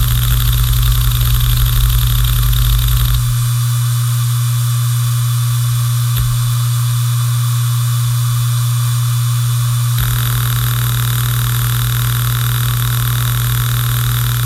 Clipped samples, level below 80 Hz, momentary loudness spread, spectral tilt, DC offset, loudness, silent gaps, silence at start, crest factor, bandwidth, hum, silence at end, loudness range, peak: under 0.1%; -20 dBFS; 1 LU; -4 dB/octave; under 0.1%; -15 LUFS; none; 0 s; 12 dB; 16.5 kHz; none; 0 s; 1 LU; -2 dBFS